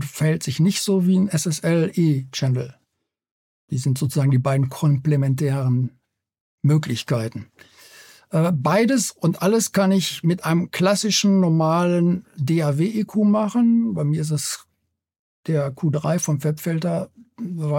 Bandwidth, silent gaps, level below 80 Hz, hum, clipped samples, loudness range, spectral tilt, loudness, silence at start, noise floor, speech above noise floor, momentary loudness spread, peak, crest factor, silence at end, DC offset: 17 kHz; 3.31-3.68 s, 6.41-6.58 s, 15.19-15.43 s; -64 dBFS; none; under 0.1%; 5 LU; -6 dB/octave; -21 LUFS; 0 s; -75 dBFS; 56 dB; 8 LU; -6 dBFS; 14 dB; 0 s; under 0.1%